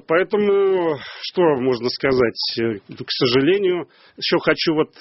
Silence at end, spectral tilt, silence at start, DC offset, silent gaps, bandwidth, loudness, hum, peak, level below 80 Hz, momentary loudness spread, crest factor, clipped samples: 0.15 s; -3.5 dB/octave; 0.1 s; under 0.1%; none; 6 kHz; -19 LUFS; none; -2 dBFS; -54 dBFS; 9 LU; 16 dB; under 0.1%